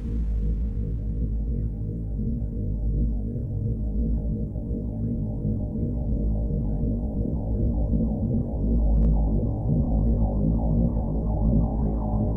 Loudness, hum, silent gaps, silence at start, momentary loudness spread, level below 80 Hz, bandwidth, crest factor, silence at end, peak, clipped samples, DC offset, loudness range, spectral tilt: -27 LUFS; none; none; 0 s; 6 LU; -26 dBFS; 1.2 kHz; 14 dB; 0 s; -10 dBFS; under 0.1%; under 0.1%; 4 LU; -13.5 dB/octave